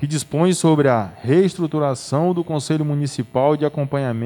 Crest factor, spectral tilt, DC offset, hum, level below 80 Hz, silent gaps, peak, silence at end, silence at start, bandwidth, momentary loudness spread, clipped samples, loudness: 14 dB; -6.5 dB/octave; under 0.1%; none; -58 dBFS; none; -4 dBFS; 0 s; 0 s; 17.5 kHz; 7 LU; under 0.1%; -19 LUFS